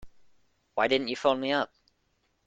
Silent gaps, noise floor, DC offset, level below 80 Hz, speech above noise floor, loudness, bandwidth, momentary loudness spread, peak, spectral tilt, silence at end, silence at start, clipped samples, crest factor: none; -73 dBFS; under 0.1%; -64 dBFS; 46 dB; -28 LUFS; 8.8 kHz; 10 LU; -10 dBFS; -4.5 dB/octave; 0.8 s; 0 s; under 0.1%; 22 dB